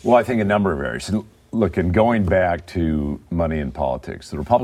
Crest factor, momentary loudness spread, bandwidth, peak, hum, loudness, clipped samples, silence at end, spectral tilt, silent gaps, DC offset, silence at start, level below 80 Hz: 18 dB; 9 LU; 13 kHz; -2 dBFS; none; -21 LUFS; under 0.1%; 0 s; -7.5 dB/octave; none; under 0.1%; 0.05 s; -36 dBFS